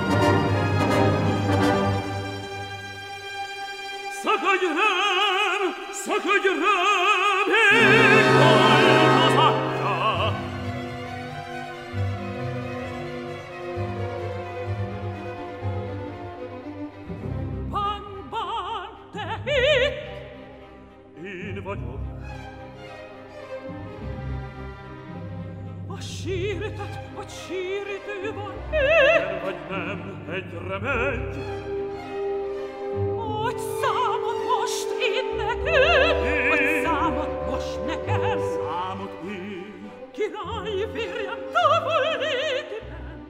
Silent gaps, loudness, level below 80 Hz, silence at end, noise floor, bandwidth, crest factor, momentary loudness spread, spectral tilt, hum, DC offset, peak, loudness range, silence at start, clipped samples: none; -23 LUFS; -44 dBFS; 0 s; -46 dBFS; 16 kHz; 20 dB; 19 LU; -5 dB/octave; none; under 0.1%; -4 dBFS; 16 LU; 0 s; under 0.1%